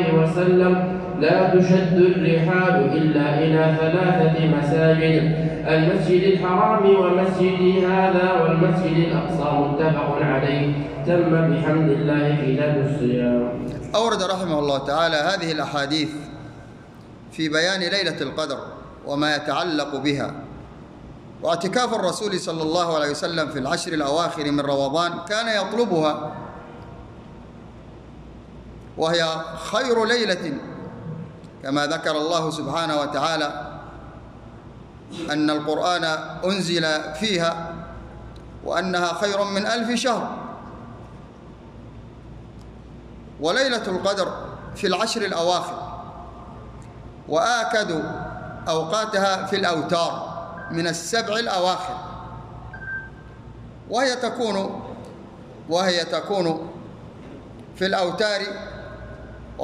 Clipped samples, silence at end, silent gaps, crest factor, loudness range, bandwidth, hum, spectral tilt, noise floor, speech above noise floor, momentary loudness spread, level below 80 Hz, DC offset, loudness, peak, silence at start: under 0.1%; 0 s; none; 18 dB; 9 LU; 12 kHz; none; -5.5 dB/octave; -42 dBFS; 22 dB; 23 LU; -48 dBFS; under 0.1%; -21 LUFS; -4 dBFS; 0 s